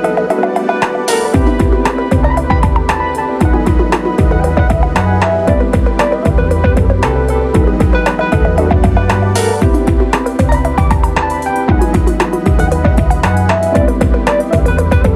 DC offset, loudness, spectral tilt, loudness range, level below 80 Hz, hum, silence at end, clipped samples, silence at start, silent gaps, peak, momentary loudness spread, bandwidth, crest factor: under 0.1%; -13 LUFS; -7 dB/octave; 1 LU; -16 dBFS; none; 0 s; under 0.1%; 0 s; none; 0 dBFS; 2 LU; 13 kHz; 10 dB